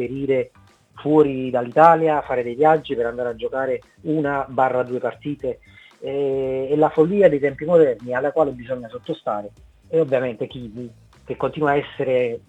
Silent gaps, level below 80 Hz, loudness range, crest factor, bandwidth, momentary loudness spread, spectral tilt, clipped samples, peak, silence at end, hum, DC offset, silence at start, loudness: none; -54 dBFS; 6 LU; 20 dB; 8 kHz; 14 LU; -8 dB/octave; under 0.1%; 0 dBFS; 0.1 s; none; under 0.1%; 0 s; -20 LUFS